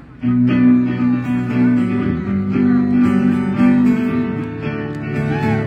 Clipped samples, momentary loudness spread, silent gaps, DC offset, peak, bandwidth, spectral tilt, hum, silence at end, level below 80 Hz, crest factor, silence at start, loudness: under 0.1%; 10 LU; none; under 0.1%; -2 dBFS; 5.2 kHz; -9 dB/octave; none; 0 s; -44 dBFS; 12 dB; 0 s; -16 LUFS